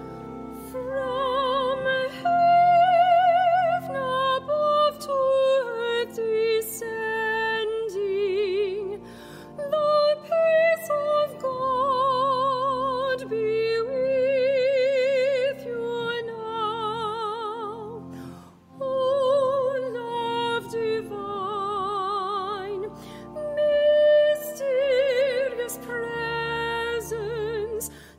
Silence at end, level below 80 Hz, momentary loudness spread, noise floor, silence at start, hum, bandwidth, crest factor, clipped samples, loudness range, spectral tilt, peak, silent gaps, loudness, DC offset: 0.05 s; -58 dBFS; 13 LU; -46 dBFS; 0 s; none; 16 kHz; 14 dB; under 0.1%; 7 LU; -4 dB/octave; -10 dBFS; none; -24 LUFS; under 0.1%